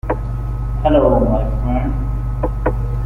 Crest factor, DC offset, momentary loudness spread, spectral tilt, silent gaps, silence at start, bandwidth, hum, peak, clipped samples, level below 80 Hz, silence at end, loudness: 14 dB; under 0.1%; 10 LU; -10 dB/octave; none; 0.05 s; 3.5 kHz; 50 Hz at -20 dBFS; -2 dBFS; under 0.1%; -20 dBFS; 0 s; -18 LUFS